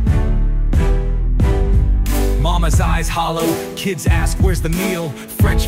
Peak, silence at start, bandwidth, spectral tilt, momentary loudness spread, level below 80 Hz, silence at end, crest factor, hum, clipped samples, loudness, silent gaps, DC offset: -4 dBFS; 0 s; 16.5 kHz; -5.5 dB/octave; 5 LU; -16 dBFS; 0 s; 10 dB; none; under 0.1%; -18 LUFS; none; under 0.1%